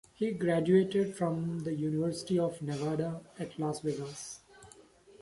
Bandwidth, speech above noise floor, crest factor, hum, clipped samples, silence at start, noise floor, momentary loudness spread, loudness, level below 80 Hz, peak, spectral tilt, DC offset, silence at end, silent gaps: 11.5 kHz; 26 dB; 18 dB; none; under 0.1%; 0.2 s; -58 dBFS; 15 LU; -32 LUFS; -68 dBFS; -14 dBFS; -6.5 dB/octave; under 0.1%; 0.4 s; none